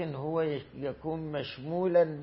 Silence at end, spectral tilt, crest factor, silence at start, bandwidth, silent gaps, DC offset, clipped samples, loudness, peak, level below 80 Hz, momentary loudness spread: 0 s; -10.5 dB/octave; 16 dB; 0 s; 5.8 kHz; none; under 0.1%; under 0.1%; -32 LUFS; -14 dBFS; -62 dBFS; 10 LU